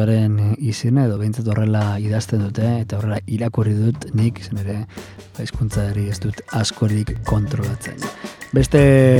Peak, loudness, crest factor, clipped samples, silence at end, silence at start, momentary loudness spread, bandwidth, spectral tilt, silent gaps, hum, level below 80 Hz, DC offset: 0 dBFS; -20 LUFS; 18 dB; under 0.1%; 0 s; 0 s; 12 LU; 13 kHz; -7 dB/octave; none; none; -36 dBFS; under 0.1%